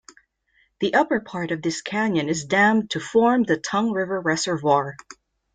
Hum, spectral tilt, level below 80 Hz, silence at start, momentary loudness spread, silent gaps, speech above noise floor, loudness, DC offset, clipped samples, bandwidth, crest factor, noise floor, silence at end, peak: none; -4.5 dB/octave; -62 dBFS; 0.8 s; 8 LU; none; 43 dB; -22 LUFS; under 0.1%; under 0.1%; 9.4 kHz; 18 dB; -65 dBFS; 0.4 s; -4 dBFS